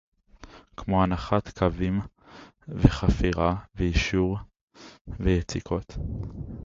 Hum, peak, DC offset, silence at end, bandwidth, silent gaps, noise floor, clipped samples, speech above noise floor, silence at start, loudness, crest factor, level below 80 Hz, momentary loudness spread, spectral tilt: none; 0 dBFS; under 0.1%; 0 s; 7.6 kHz; 4.61-4.68 s, 5.01-5.05 s; -50 dBFS; under 0.1%; 25 dB; 0.4 s; -27 LUFS; 26 dB; -34 dBFS; 16 LU; -7 dB/octave